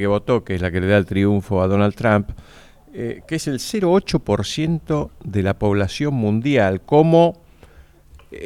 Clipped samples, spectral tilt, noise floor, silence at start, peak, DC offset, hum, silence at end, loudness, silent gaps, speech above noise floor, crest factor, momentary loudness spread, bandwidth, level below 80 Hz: under 0.1%; -6.5 dB/octave; -47 dBFS; 0 s; -2 dBFS; under 0.1%; none; 0 s; -19 LUFS; none; 29 dB; 18 dB; 10 LU; 14.5 kHz; -42 dBFS